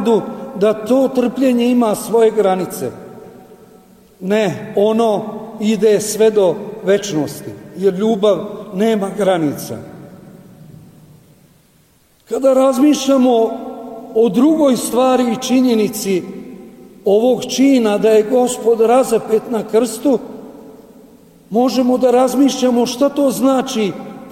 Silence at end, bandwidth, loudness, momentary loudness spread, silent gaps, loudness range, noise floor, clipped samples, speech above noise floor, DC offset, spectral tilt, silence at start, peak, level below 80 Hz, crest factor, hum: 0 s; 16.5 kHz; -15 LUFS; 14 LU; none; 5 LU; -53 dBFS; under 0.1%; 39 dB; under 0.1%; -5 dB/octave; 0 s; -4 dBFS; -56 dBFS; 12 dB; none